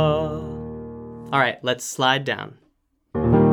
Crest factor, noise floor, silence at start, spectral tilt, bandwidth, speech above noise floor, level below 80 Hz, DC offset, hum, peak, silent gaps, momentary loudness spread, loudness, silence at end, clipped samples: 18 dB; -66 dBFS; 0 s; -5 dB/octave; 19 kHz; 44 dB; -42 dBFS; under 0.1%; none; -4 dBFS; none; 16 LU; -23 LUFS; 0 s; under 0.1%